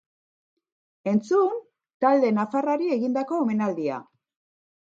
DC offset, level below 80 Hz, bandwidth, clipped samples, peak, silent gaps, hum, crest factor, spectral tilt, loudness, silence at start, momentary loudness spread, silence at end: under 0.1%; -78 dBFS; 7.6 kHz; under 0.1%; -8 dBFS; 1.94-2.00 s; none; 18 dB; -7.5 dB/octave; -24 LUFS; 1.05 s; 10 LU; 0.8 s